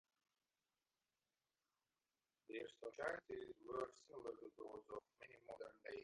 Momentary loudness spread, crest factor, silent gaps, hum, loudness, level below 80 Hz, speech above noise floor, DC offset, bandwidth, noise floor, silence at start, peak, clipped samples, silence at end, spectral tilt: 9 LU; 22 dB; none; none; -53 LUFS; -84 dBFS; over 37 dB; under 0.1%; 11 kHz; under -90 dBFS; 2.5 s; -32 dBFS; under 0.1%; 0 s; -4.5 dB/octave